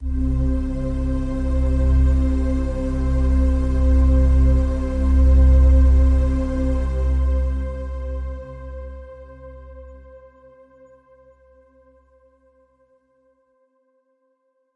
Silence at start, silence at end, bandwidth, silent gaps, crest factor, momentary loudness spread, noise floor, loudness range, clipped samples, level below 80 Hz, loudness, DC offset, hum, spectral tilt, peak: 0 s; 4.6 s; 3.8 kHz; none; 14 dB; 21 LU; -67 dBFS; 18 LU; under 0.1%; -20 dBFS; -20 LUFS; under 0.1%; none; -9.5 dB/octave; -6 dBFS